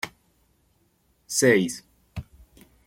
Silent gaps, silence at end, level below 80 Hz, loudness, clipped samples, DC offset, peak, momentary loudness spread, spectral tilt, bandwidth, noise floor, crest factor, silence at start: none; 0.65 s; -56 dBFS; -22 LUFS; under 0.1%; under 0.1%; -6 dBFS; 22 LU; -4 dB/octave; 16.5 kHz; -66 dBFS; 22 dB; 0.05 s